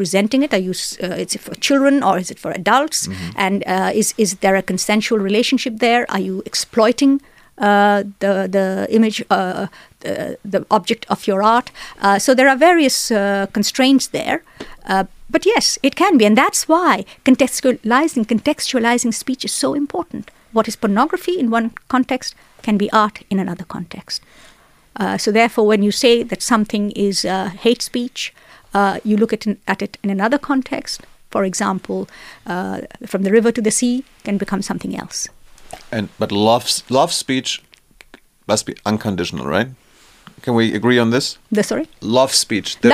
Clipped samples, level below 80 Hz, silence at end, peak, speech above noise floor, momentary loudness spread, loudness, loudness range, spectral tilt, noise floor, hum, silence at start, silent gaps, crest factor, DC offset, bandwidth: under 0.1%; -52 dBFS; 0 s; 0 dBFS; 32 dB; 11 LU; -17 LUFS; 5 LU; -4 dB/octave; -49 dBFS; none; 0 s; none; 16 dB; under 0.1%; 15.5 kHz